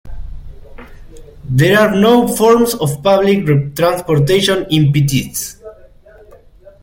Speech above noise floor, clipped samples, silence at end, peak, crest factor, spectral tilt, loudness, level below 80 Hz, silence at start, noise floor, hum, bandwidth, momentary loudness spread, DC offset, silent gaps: 30 dB; under 0.1%; 1.1 s; 0 dBFS; 14 dB; -5.5 dB/octave; -13 LUFS; -36 dBFS; 0.05 s; -41 dBFS; none; 16.5 kHz; 11 LU; under 0.1%; none